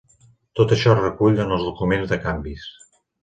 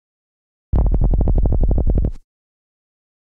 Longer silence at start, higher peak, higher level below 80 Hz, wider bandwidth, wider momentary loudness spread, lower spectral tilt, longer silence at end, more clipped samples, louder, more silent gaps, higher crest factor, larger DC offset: second, 0.55 s vs 0.75 s; first, -2 dBFS vs -8 dBFS; second, -40 dBFS vs -18 dBFS; first, 9 kHz vs 1.6 kHz; first, 16 LU vs 4 LU; second, -7 dB/octave vs -12.5 dB/octave; second, 0.55 s vs 1.05 s; neither; about the same, -20 LUFS vs -20 LUFS; neither; first, 20 dB vs 10 dB; neither